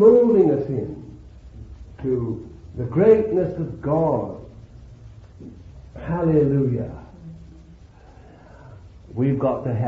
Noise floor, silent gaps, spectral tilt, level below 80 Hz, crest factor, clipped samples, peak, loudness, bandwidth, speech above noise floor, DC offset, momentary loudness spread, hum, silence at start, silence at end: -46 dBFS; none; -11 dB/octave; -46 dBFS; 18 dB; under 0.1%; -2 dBFS; -21 LUFS; 4.4 kHz; 25 dB; under 0.1%; 26 LU; none; 0 s; 0 s